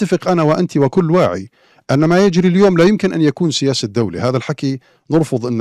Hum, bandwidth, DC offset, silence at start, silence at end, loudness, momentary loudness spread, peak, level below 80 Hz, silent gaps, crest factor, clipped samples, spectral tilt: none; 12 kHz; under 0.1%; 0 s; 0 s; -15 LUFS; 7 LU; -4 dBFS; -50 dBFS; none; 12 dB; under 0.1%; -6.5 dB/octave